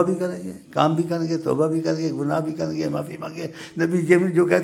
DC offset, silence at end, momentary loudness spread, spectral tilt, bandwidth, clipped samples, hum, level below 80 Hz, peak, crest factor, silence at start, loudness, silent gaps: under 0.1%; 0 s; 14 LU; -7 dB/octave; 14.5 kHz; under 0.1%; none; -64 dBFS; -2 dBFS; 20 dB; 0 s; -23 LUFS; none